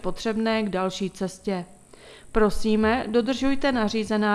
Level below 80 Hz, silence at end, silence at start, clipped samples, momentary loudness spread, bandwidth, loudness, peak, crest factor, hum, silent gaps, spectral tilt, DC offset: -42 dBFS; 0 s; 0.05 s; under 0.1%; 8 LU; 12.5 kHz; -25 LUFS; -6 dBFS; 18 dB; none; none; -5.5 dB/octave; under 0.1%